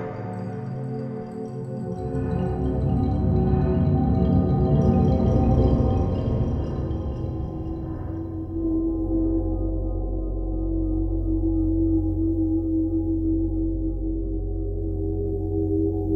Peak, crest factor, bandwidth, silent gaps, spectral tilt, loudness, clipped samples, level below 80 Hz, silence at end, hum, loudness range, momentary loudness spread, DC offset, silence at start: -8 dBFS; 16 dB; 6 kHz; none; -11 dB/octave; -25 LUFS; under 0.1%; -30 dBFS; 0 s; none; 6 LU; 11 LU; under 0.1%; 0 s